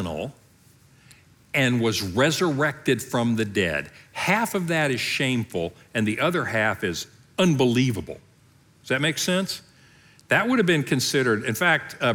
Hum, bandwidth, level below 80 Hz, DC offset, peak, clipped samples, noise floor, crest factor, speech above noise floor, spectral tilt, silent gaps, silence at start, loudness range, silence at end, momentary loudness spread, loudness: none; 19.5 kHz; -62 dBFS; under 0.1%; -6 dBFS; under 0.1%; -57 dBFS; 18 dB; 33 dB; -4.5 dB/octave; none; 0 s; 2 LU; 0 s; 10 LU; -23 LUFS